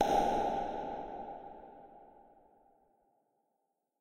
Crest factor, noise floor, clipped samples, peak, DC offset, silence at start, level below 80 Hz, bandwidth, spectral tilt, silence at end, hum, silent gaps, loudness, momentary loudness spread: 22 dB; -83 dBFS; under 0.1%; -16 dBFS; under 0.1%; 0 s; -58 dBFS; 16 kHz; -5 dB/octave; 1.9 s; none; none; -36 LUFS; 25 LU